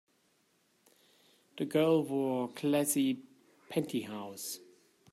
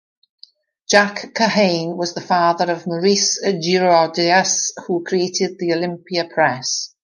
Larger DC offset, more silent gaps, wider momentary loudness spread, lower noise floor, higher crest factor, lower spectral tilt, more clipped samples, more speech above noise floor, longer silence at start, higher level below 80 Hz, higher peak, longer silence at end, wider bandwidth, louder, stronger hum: neither; neither; first, 13 LU vs 7 LU; first, -73 dBFS vs -49 dBFS; about the same, 18 dB vs 18 dB; first, -5 dB/octave vs -3 dB/octave; neither; first, 41 dB vs 31 dB; first, 1.55 s vs 0.9 s; second, -80 dBFS vs -68 dBFS; second, -16 dBFS vs -2 dBFS; first, 0.55 s vs 0.15 s; first, 16 kHz vs 11 kHz; second, -33 LUFS vs -17 LUFS; neither